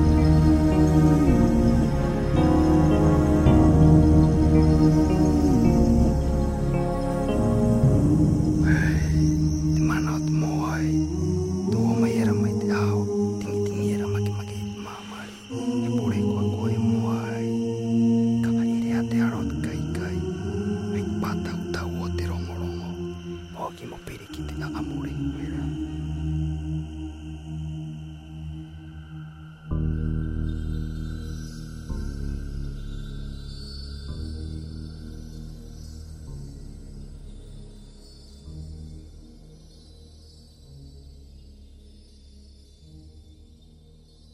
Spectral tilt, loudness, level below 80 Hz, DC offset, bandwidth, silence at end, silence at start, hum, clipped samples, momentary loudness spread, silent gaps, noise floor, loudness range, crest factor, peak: -8 dB/octave; -23 LUFS; -32 dBFS; under 0.1%; 14 kHz; 1.15 s; 0 s; none; under 0.1%; 21 LU; none; -51 dBFS; 22 LU; 18 dB; -4 dBFS